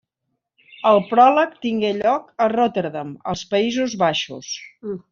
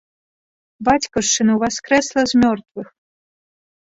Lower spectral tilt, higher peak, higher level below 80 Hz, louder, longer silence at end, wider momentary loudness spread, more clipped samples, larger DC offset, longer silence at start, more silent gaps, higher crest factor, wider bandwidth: about the same, -3 dB/octave vs -3 dB/octave; about the same, -2 dBFS vs -2 dBFS; second, -60 dBFS vs -48 dBFS; about the same, -19 LUFS vs -17 LUFS; second, 0.15 s vs 1.15 s; first, 16 LU vs 10 LU; neither; neither; about the same, 0.8 s vs 0.8 s; second, none vs 2.71-2.75 s; about the same, 18 dB vs 18 dB; about the same, 7.4 kHz vs 8 kHz